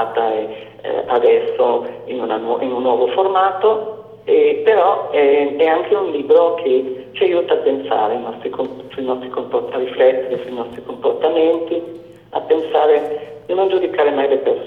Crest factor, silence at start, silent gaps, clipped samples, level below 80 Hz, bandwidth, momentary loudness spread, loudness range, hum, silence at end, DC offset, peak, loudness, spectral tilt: 16 dB; 0 s; none; under 0.1%; -62 dBFS; 4.2 kHz; 12 LU; 4 LU; none; 0 s; under 0.1%; -2 dBFS; -17 LUFS; -7 dB/octave